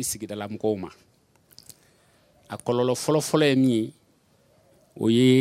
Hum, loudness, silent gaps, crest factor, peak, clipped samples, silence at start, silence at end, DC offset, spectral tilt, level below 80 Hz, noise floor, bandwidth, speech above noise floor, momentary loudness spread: none; -24 LUFS; none; 18 dB; -6 dBFS; under 0.1%; 0 s; 0 s; under 0.1%; -5.5 dB/octave; -66 dBFS; -62 dBFS; 16 kHz; 39 dB; 14 LU